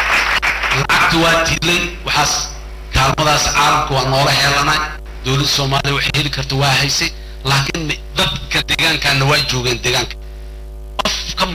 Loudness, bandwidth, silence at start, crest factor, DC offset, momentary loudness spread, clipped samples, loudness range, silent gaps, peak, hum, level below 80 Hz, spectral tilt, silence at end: -14 LUFS; 16 kHz; 0 s; 10 dB; under 0.1%; 12 LU; under 0.1%; 2 LU; none; -4 dBFS; none; -30 dBFS; -3 dB/octave; 0 s